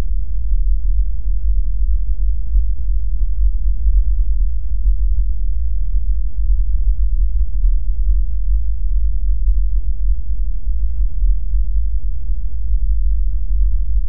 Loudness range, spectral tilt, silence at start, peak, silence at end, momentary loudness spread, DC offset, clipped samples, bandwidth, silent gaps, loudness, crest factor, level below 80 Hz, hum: 1 LU; -14.5 dB/octave; 0 s; -2 dBFS; 0 s; 3 LU; 20%; under 0.1%; 0.5 kHz; none; -22 LUFS; 10 dB; -16 dBFS; none